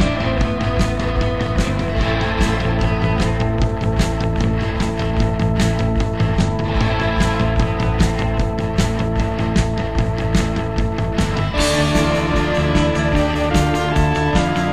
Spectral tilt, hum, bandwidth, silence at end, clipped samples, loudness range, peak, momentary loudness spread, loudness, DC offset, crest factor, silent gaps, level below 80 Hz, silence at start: -6 dB/octave; none; 13.5 kHz; 0 s; under 0.1%; 2 LU; -2 dBFS; 3 LU; -18 LUFS; 2%; 16 dB; none; -24 dBFS; 0 s